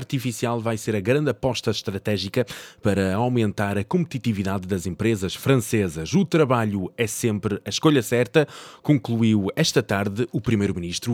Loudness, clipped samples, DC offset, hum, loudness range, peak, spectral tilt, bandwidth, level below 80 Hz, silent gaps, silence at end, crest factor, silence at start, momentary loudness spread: -23 LUFS; under 0.1%; under 0.1%; none; 3 LU; -4 dBFS; -5.5 dB/octave; 17.5 kHz; -52 dBFS; none; 0 s; 18 dB; 0 s; 7 LU